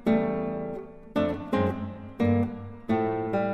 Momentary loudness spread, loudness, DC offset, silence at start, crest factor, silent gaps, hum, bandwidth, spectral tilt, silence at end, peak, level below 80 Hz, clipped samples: 11 LU; -28 LUFS; under 0.1%; 0 s; 16 dB; none; none; 6.4 kHz; -9 dB/octave; 0 s; -12 dBFS; -54 dBFS; under 0.1%